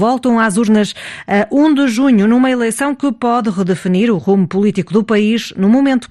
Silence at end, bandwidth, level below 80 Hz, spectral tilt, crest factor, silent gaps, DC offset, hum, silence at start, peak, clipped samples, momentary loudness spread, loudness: 0.05 s; 12.5 kHz; -52 dBFS; -6 dB/octave; 12 dB; none; under 0.1%; none; 0 s; 0 dBFS; under 0.1%; 5 LU; -13 LUFS